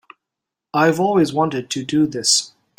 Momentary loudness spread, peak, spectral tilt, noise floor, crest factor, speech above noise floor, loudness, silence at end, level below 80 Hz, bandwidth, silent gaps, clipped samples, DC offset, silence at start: 6 LU; -2 dBFS; -3.5 dB/octave; -84 dBFS; 18 dB; 66 dB; -18 LUFS; 0.3 s; -60 dBFS; 16.5 kHz; none; under 0.1%; under 0.1%; 0.75 s